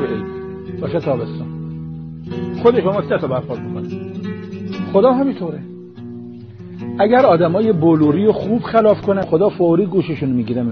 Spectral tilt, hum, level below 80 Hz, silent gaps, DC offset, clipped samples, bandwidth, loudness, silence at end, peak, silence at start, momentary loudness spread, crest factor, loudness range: -7 dB/octave; none; -50 dBFS; none; under 0.1%; under 0.1%; 6.4 kHz; -17 LUFS; 0 s; -2 dBFS; 0 s; 18 LU; 16 dB; 6 LU